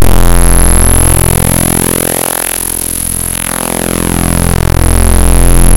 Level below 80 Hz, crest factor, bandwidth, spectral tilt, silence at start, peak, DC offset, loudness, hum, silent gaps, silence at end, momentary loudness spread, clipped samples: -12 dBFS; 8 dB; 17.5 kHz; -4 dB/octave; 0 s; 0 dBFS; under 0.1%; -9 LUFS; none; none; 0 s; 5 LU; 4%